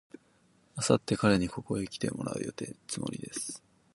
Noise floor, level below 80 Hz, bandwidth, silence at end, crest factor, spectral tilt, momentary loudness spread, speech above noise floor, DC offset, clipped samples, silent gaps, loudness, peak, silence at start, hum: -66 dBFS; -58 dBFS; 11.5 kHz; 0.35 s; 24 dB; -5 dB/octave; 13 LU; 35 dB; under 0.1%; under 0.1%; none; -32 LUFS; -8 dBFS; 0.75 s; none